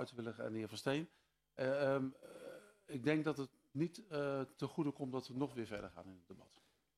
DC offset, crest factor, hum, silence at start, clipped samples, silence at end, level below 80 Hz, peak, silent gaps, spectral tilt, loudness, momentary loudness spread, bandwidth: under 0.1%; 22 dB; none; 0 s; under 0.1%; 0.55 s; -76 dBFS; -22 dBFS; none; -6.5 dB/octave; -42 LUFS; 20 LU; 13.5 kHz